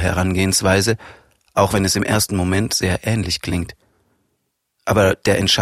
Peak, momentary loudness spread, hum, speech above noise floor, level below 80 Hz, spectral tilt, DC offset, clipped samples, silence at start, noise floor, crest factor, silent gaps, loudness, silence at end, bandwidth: -2 dBFS; 9 LU; none; 54 dB; -40 dBFS; -4 dB/octave; under 0.1%; under 0.1%; 0 s; -71 dBFS; 18 dB; none; -18 LUFS; 0 s; 15.5 kHz